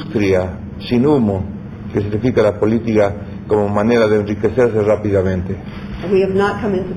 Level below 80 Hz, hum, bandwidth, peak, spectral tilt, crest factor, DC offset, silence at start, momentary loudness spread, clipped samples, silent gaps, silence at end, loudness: -38 dBFS; none; 11 kHz; -2 dBFS; -8 dB/octave; 14 dB; under 0.1%; 0 s; 12 LU; under 0.1%; none; 0 s; -16 LUFS